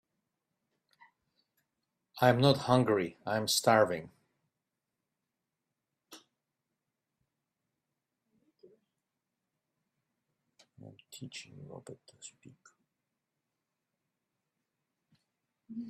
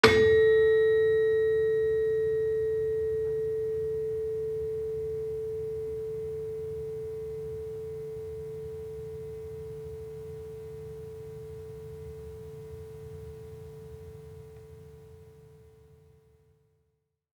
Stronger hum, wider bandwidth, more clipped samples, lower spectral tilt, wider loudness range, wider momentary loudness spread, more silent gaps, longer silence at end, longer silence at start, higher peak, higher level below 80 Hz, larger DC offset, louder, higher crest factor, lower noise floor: neither; about the same, 13.5 kHz vs 12.5 kHz; neither; about the same, -4.5 dB/octave vs -5.5 dB/octave; first, 23 LU vs 20 LU; first, 25 LU vs 22 LU; neither; second, 0 s vs 1.75 s; first, 2.15 s vs 0.05 s; second, -10 dBFS vs -4 dBFS; second, -74 dBFS vs -56 dBFS; neither; about the same, -28 LUFS vs -29 LUFS; about the same, 28 dB vs 26 dB; first, -88 dBFS vs -77 dBFS